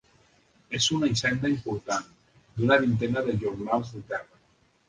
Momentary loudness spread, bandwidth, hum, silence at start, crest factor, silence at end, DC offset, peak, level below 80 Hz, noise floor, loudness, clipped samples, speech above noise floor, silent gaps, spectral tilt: 13 LU; 10 kHz; none; 0.7 s; 22 dB; 0.65 s; under 0.1%; -6 dBFS; -56 dBFS; -65 dBFS; -27 LUFS; under 0.1%; 39 dB; none; -4.5 dB/octave